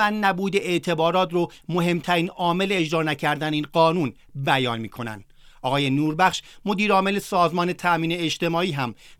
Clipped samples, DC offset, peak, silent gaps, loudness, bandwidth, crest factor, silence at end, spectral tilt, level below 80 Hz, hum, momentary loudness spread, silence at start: under 0.1%; under 0.1%; -4 dBFS; none; -23 LUFS; 17 kHz; 18 dB; 0.1 s; -5.5 dB/octave; -56 dBFS; none; 9 LU; 0 s